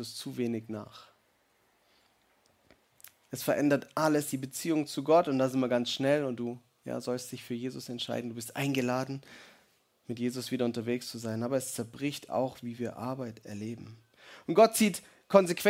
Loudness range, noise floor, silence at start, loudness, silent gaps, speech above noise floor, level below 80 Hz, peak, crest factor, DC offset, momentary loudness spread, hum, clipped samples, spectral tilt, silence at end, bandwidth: 7 LU; -70 dBFS; 0 s; -31 LUFS; none; 40 dB; -74 dBFS; -6 dBFS; 26 dB; under 0.1%; 16 LU; none; under 0.1%; -5 dB/octave; 0 s; 16.5 kHz